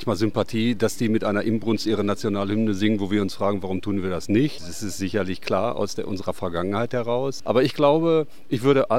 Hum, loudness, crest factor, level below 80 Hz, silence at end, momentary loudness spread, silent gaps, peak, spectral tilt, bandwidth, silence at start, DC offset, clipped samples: none; -24 LUFS; 18 dB; -54 dBFS; 0 s; 8 LU; none; -6 dBFS; -6 dB/octave; 16 kHz; 0 s; 2%; under 0.1%